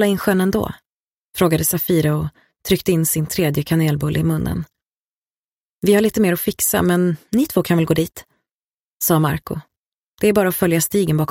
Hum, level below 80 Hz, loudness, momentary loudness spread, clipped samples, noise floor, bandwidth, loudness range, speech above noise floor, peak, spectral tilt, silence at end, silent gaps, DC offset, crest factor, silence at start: none; -44 dBFS; -18 LUFS; 10 LU; under 0.1%; under -90 dBFS; 17 kHz; 2 LU; over 73 dB; -2 dBFS; -5.5 dB/octave; 0.05 s; 0.94-1.29 s, 4.82-4.86 s, 4.99-5.82 s, 8.51-9.00 s, 9.77-10.18 s; under 0.1%; 16 dB; 0 s